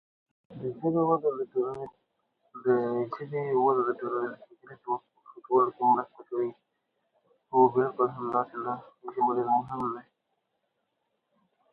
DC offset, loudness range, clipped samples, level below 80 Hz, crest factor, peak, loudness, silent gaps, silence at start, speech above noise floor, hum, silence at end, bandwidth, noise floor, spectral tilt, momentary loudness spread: under 0.1%; 3 LU; under 0.1%; -74 dBFS; 22 dB; -8 dBFS; -29 LUFS; none; 0.5 s; 51 dB; none; 1.7 s; 4.7 kHz; -79 dBFS; -10.5 dB/octave; 14 LU